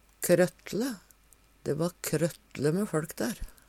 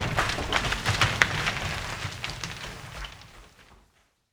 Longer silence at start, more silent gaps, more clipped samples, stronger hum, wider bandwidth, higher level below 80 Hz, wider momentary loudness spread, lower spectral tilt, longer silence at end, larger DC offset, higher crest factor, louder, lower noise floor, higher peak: first, 0.2 s vs 0 s; neither; neither; neither; second, 17 kHz vs over 20 kHz; second, -52 dBFS vs -42 dBFS; second, 10 LU vs 17 LU; first, -5.5 dB/octave vs -3 dB/octave; second, 0.2 s vs 0.55 s; neither; second, 20 dB vs 30 dB; second, -30 LUFS vs -27 LUFS; second, -61 dBFS vs -65 dBFS; second, -10 dBFS vs 0 dBFS